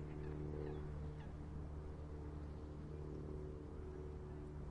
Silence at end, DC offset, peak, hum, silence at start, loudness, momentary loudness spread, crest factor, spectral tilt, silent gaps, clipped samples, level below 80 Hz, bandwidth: 0 s; under 0.1%; -34 dBFS; none; 0 s; -50 LUFS; 4 LU; 14 dB; -9 dB/octave; none; under 0.1%; -54 dBFS; 9.4 kHz